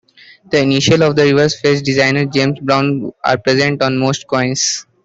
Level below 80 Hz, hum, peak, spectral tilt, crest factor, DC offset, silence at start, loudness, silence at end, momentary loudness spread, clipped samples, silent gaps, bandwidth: -50 dBFS; none; -2 dBFS; -4.5 dB/octave; 12 dB; under 0.1%; 0.5 s; -14 LUFS; 0.25 s; 6 LU; under 0.1%; none; 8.2 kHz